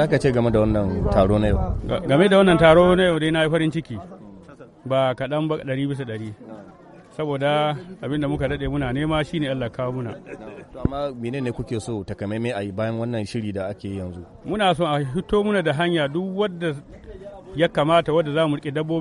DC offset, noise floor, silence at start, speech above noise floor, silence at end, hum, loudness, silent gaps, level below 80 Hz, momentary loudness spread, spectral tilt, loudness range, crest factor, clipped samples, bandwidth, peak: under 0.1%; -44 dBFS; 0 s; 23 dB; 0 s; none; -22 LUFS; none; -38 dBFS; 17 LU; -7 dB/octave; 10 LU; 20 dB; under 0.1%; 11.5 kHz; -2 dBFS